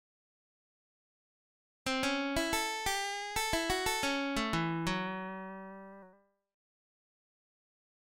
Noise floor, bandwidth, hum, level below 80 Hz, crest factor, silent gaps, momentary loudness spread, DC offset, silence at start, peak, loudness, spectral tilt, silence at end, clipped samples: -64 dBFS; 16.5 kHz; none; -54 dBFS; 20 dB; none; 13 LU; under 0.1%; 1.85 s; -18 dBFS; -34 LUFS; -3 dB/octave; 2.05 s; under 0.1%